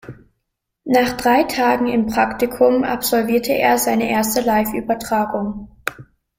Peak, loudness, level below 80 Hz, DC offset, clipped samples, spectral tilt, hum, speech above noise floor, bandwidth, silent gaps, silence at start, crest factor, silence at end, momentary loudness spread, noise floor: -2 dBFS; -18 LUFS; -46 dBFS; under 0.1%; under 0.1%; -4 dB/octave; none; 58 dB; 16.5 kHz; none; 0.05 s; 16 dB; 0.35 s; 11 LU; -75 dBFS